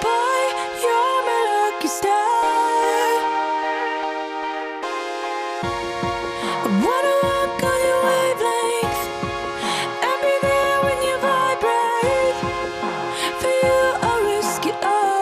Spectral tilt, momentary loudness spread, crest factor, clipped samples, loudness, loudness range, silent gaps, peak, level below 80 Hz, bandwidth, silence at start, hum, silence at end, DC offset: -3.5 dB/octave; 7 LU; 14 dB; under 0.1%; -20 LUFS; 4 LU; none; -6 dBFS; -48 dBFS; 15 kHz; 0 s; none; 0 s; under 0.1%